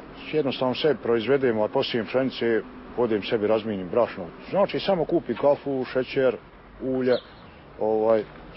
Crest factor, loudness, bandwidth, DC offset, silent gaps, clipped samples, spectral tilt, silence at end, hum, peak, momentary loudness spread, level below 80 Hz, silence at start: 16 dB; -25 LUFS; 5.8 kHz; under 0.1%; none; under 0.1%; -10 dB/octave; 0 s; none; -8 dBFS; 6 LU; -54 dBFS; 0 s